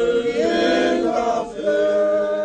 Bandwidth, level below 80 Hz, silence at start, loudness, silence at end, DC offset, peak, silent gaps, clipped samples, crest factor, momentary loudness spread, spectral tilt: 9.4 kHz; -52 dBFS; 0 s; -19 LUFS; 0 s; under 0.1%; -8 dBFS; none; under 0.1%; 12 dB; 4 LU; -4.5 dB/octave